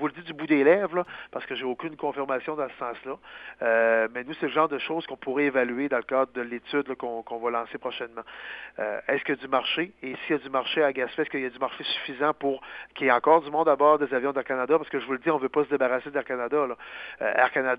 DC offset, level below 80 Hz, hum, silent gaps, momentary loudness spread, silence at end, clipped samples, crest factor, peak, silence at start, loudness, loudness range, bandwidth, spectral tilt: under 0.1%; -68 dBFS; none; none; 14 LU; 0 s; under 0.1%; 20 dB; -6 dBFS; 0 s; -26 LUFS; 6 LU; 5.2 kHz; -7.5 dB/octave